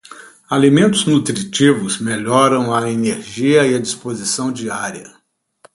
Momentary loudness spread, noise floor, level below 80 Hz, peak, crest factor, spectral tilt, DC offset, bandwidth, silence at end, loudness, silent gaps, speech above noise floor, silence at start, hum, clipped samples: 10 LU; -51 dBFS; -56 dBFS; 0 dBFS; 16 dB; -4.5 dB/octave; under 0.1%; 11.5 kHz; 0.65 s; -16 LUFS; none; 36 dB; 0.1 s; none; under 0.1%